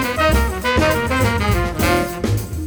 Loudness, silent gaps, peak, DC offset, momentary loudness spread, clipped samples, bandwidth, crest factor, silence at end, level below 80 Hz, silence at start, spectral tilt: -18 LUFS; none; -2 dBFS; under 0.1%; 4 LU; under 0.1%; over 20 kHz; 14 dB; 0 s; -26 dBFS; 0 s; -5 dB/octave